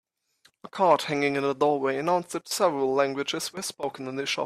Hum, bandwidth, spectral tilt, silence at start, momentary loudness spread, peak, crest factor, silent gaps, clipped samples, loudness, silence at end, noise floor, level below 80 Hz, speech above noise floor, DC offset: none; 15 kHz; -3.5 dB/octave; 0.65 s; 9 LU; -8 dBFS; 18 dB; none; under 0.1%; -26 LUFS; 0 s; -65 dBFS; -72 dBFS; 39 dB; under 0.1%